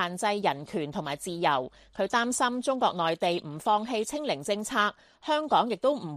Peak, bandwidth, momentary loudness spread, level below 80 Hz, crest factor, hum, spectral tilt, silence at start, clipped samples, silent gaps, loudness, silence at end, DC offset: -10 dBFS; 15 kHz; 8 LU; -66 dBFS; 18 dB; none; -3.5 dB/octave; 0 s; under 0.1%; none; -28 LUFS; 0 s; under 0.1%